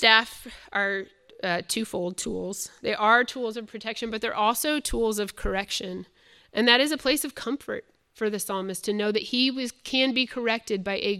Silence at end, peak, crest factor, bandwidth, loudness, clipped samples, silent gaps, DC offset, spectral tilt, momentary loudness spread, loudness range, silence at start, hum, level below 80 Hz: 0 s; -2 dBFS; 24 dB; 16 kHz; -26 LUFS; under 0.1%; none; under 0.1%; -2.5 dB/octave; 13 LU; 2 LU; 0 s; none; -48 dBFS